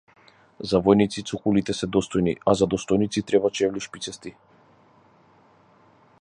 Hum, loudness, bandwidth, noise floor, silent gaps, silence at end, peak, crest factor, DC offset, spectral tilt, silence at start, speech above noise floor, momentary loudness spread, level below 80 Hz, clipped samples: none; -23 LUFS; 11 kHz; -57 dBFS; none; 1.9 s; -2 dBFS; 22 dB; under 0.1%; -5.5 dB/octave; 0.6 s; 34 dB; 14 LU; -52 dBFS; under 0.1%